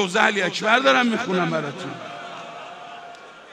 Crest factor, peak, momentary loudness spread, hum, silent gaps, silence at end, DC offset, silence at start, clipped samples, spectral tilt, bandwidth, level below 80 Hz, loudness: 20 dB; -2 dBFS; 21 LU; none; none; 0 s; under 0.1%; 0 s; under 0.1%; -4 dB/octave; 13.5 kHz; -72 dBFS; -20 LUFS